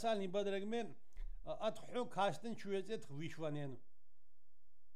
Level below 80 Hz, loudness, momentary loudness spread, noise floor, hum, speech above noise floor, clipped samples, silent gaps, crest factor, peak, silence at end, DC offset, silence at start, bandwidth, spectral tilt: -58 dBFS; -43 LUFS; 13 LU; -78 dBFS; none; 36 dB; under 0.1%; none; 18 dB; -26 dBFS; 1.15 s; 0.5%; 0 s; 14 kHz; -5.5 dB/octave